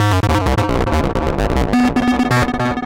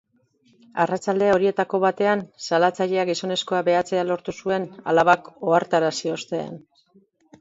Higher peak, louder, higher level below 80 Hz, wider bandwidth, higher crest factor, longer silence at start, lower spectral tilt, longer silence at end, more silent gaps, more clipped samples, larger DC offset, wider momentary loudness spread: second, -8 dBFS vs -4 dBFS; first, -16 LUFS vs -22 LUFS; first, -24 dBFS vs -64 dBFS; first, 17 kHz vs 8 kHz; second, 8 dB vs 18 dB; second, 0 s vs 0.75 s; first, -6.5 dB/octave vs -5 dB/octave; second, 0 s vs 0.85 s; neither; neither; first, 0.6% vs under 0.1%; second, 3 LU vs 8 LU